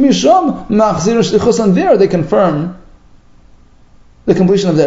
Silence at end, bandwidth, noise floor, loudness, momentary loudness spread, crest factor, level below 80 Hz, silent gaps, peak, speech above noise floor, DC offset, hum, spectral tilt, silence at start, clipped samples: 0 s; 8 kHz; -42 dBFS; -12 LUFS; 6 LU; 12 dB; -40 dBFS; none; 0 dBFS; 32 dB; under 0.1%; 60 Hz at -40 dBFS; -6 dB/octave; 0 s; 0.1%